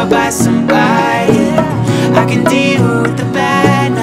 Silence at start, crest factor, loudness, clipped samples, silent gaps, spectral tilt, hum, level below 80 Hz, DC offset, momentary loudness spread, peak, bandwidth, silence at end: 0 s; 10 dB; -11 LUFS; 0.3%; none; -5.5 dB/octave; none; -40 dBFS; under 0.1%; 3 LU; 0 dBFS; 16 kHz; 0 s